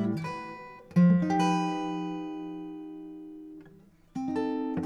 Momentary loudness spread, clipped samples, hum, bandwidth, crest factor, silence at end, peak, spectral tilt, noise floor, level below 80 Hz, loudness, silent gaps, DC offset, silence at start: 22 LU; under 0.1%; none; 9 kHz; 16 dB; 0 s; -14 dBFS; -7.5 dB/octave; -56 dBFS; -66 dBFS; -29 LUFS; none; under 0.1%; 0 s